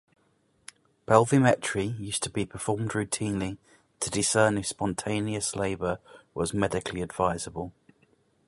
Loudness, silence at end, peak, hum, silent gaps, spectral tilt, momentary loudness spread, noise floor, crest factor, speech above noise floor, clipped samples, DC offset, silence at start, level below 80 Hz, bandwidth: -28 LUFS; 0.75 s; -4 dBFS; none; none; -4.5 dB/octave; 13 LU; -68 dBFS; 26 dB; 41 dB; under 0.1%; under 0.1%; 1.1 s; -54 dBFS; 11.5 kHz